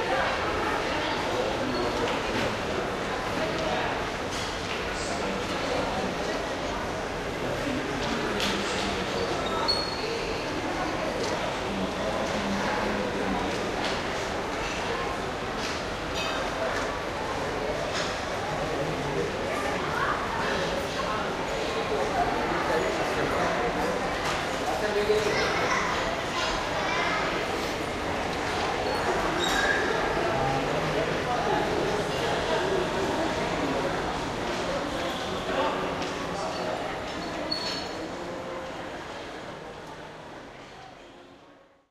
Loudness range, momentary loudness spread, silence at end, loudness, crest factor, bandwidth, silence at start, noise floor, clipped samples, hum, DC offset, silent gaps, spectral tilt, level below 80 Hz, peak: 4 LU; 5 LU; 0.35 s; -28 LUFS; 16 dB; 15 kHz; 0 s; -55 dBFS; under 0.1%; none; under 0.1%; none; -4 dB/octave; -46 dBFS; -12 dBFS